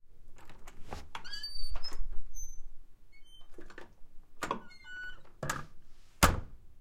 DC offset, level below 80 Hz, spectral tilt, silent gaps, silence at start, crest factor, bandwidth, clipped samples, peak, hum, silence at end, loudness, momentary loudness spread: under 0.1%; -44 dBFS; -3.5 dB/octave; none; 0.05 s; 26 dB; 16 kHz; under 0.1%; -6 dBFS; none; 0 s; -38 LUFS; 28 LU